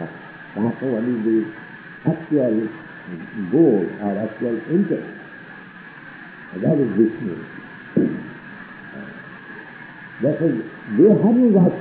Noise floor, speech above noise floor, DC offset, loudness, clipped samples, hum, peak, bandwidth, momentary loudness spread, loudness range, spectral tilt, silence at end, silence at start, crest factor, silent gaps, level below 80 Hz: -40 dBFS; 21 dB; under 0.1%; -20 LUFS; under 0.1%; none; -4 dBFS; 4.3 kHz; 22 LU; 5 LU; -8.5 dB/octave; 0 s; 0 s; 16 dB; none; -64 dBFS